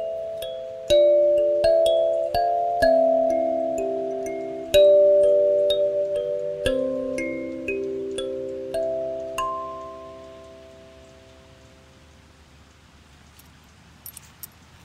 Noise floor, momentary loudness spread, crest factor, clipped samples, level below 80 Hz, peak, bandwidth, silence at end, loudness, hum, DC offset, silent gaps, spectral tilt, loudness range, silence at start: -51 dBFS; 23 LU; 20 dB; under 0.1%; -50 dBFS; -4 dBFS; 15.5 kHz; 0.75 s; -22 LUFS; none; under 0.1%; none; -4.5 dB/octave; 13 LU; 0 s